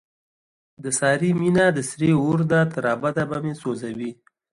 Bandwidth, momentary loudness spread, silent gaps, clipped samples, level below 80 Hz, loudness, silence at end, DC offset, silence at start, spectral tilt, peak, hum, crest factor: 11.5 kHz; 11 LU; none; under 0.1%; -58 dBFS; -21 LUFS; 0.4 s; under 0.1%; 0.8 s; -6 dB/octave; -6 dBFS; none; 16 dB